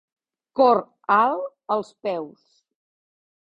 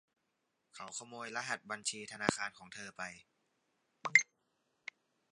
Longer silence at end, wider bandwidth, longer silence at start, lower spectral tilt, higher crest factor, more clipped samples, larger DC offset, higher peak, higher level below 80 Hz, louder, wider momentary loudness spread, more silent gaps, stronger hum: about the same, 1.2 s vs 1.1 s; second, 8.2 kHz vs 11.5 kHz; second, 0.55 s vs 0.75 s; first, -6.5 dB/octave vs -2 dB/octave; second, 20 dB vs 34 dB; neither; neither; first, -4 dBFS vs -8 dBFS; first, -70 dBFS vs -78 dBFS; first, -22 LUFS vs -36 LUFS; second, 13 LU vs 22 LU; neither; neither